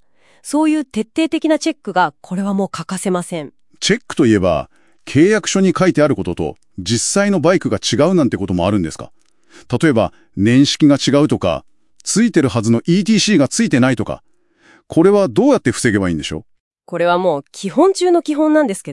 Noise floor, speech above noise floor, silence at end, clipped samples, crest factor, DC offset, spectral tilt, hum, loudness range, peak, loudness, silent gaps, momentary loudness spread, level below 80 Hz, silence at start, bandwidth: -51 dBFS; 36 dB; 0 s; under 0.1%; 16 dB; 0.3%; -5 dB/octave; none; 4 LU; 0 dBFS; -15 LUFS; 16.60-16.71 s; 11 LU; -48 dBFS; 0.45 s; 12 kHz